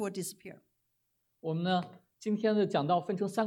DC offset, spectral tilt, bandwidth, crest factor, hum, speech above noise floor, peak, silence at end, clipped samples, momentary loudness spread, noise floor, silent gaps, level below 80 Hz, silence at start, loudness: under 0.1%; -6 dB/octave; 16.5 kHz; 18 dB; none; 47 dB; -16 dBFS; 0 s; under 0.1%; 17 LU; -79 dBFS; none; -82 dBFS; 0 s; -32 LUFS